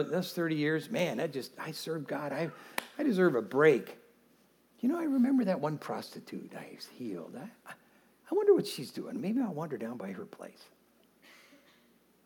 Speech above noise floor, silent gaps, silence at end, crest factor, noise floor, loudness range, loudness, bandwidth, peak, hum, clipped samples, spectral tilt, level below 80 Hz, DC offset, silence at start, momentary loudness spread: 34 dB; none; 1.6 s; 22 dB; -66 dBFS; 6 LU; -32 LUFS; 19 kHz; -12 dBFS; none; under 0.1%; -6 dB/octave; -88 dBFS; under 0.1%; 0 s; 20 LU